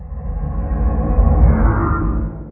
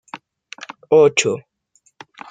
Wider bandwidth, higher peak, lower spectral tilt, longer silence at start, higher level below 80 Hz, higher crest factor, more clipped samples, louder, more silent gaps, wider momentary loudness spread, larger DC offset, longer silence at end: second, 2.6 kHz vs 9.4 kHz; about the same, 0 dBFS vs -2 dBFS; first, -14.5 dB/octave vs -3.5 dB/octave; second, 0 s vs 0.15 s; first, -16 dBFS vs -66 dBFS; about the same, 16 dB vs 18 dB; neither; about the same, -18 LUFS vs -16 LUFS; neither; second, 11 LU vs 25 LU; neither; second, 0 s vs 0.9 s